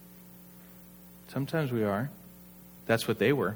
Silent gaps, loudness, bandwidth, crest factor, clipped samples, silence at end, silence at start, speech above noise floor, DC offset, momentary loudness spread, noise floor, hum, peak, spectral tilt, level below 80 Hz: none; -30 LUFS; over 20 kHz; 22 dB; under 0.1%; 0 s; 0 s; 23 dB; under 0.1%; 24 LU; -52 dBFS; none; -10 dBFS; -6 dB/octave; -66 dBFS